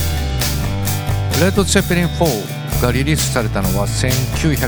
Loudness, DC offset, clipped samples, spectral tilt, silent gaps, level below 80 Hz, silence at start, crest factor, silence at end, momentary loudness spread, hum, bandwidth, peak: -17 LUFS; 1%; under 0.1%; -4.5 dB/octave; none; -26 dBFS; 0 s; 16 dB; 0 s; 5 LU; none; over 20 kHz; 0 dBFS